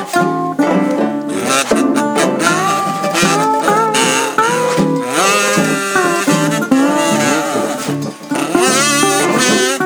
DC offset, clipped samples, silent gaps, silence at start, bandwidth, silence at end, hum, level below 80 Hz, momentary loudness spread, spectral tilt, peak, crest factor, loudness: under 0.1%; under 0.1%; none; 0 s; over 20 kHz; 0 s; none; -56 dBFS; 6 LU; -3.5 dB/octave; 0 dBFS; 14 dB; -13 LUFS